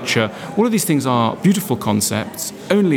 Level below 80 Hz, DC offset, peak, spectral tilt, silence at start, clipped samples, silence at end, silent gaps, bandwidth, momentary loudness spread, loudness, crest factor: -60 dBFS; under 0.1%; 0 dBFS; -4.5 dB/octave; 0 s; under 0.1%; 0 s; none; over 20 kHz; 6 LU; -18 LUFS; 16 dB